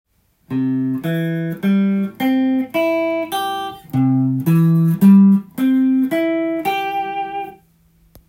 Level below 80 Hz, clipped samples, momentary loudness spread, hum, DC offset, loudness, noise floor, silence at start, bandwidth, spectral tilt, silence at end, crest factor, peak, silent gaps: -58 dBFS; under 0.1%; 11 LU; none; under 0.1%; -17 LUFS; -55 dBFS; 0.5 s; 16.5 kHz; -8 dB/octave; 0.75 s; 14 dB; -2 dBFS; none